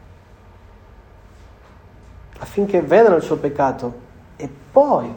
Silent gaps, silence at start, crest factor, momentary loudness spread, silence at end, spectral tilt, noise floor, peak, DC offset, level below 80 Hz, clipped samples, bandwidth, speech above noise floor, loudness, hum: none; 2.4 s; 20 dB; 21 LU; 0 s; -7.5 dB/octave; -45 dBFS; 0 dBFS; under 0.1%; -48 dBFS; under 0.1%; 19 kHz; 29 dB; -17 LUFS; none